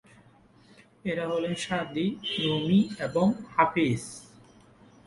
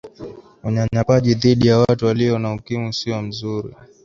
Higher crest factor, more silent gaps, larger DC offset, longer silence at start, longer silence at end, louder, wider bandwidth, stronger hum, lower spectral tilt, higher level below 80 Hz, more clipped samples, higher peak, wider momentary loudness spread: first, 24 dB vs 16 dB; neither; neither; first, 1.05 s vs 0.05 s; first, 0.8 s vs 0.2 s; second, -27 LUFS vs -18 LUFS; first, 11.5 kHz vs 7.4 kHz; neither; second, -5.5 dB/octave vs -7 dB/octave; second, -62 dBFS vs -46 dBFS; neither; second, -6 dBFS vs -2 dBFS; second, 10 LU vs 18 LU